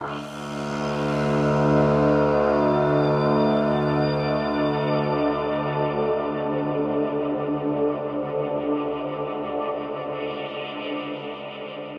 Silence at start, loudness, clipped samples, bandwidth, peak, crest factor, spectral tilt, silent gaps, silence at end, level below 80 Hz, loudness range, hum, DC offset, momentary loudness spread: 0 s; -24 LUFS; under 0.1%; 9.8 kHz; -8 dBFS; 16 dB; -7.5 dB/octave; none; 0 s; -48 dBFS; 7 LU; none; under 0.1%; 11 LU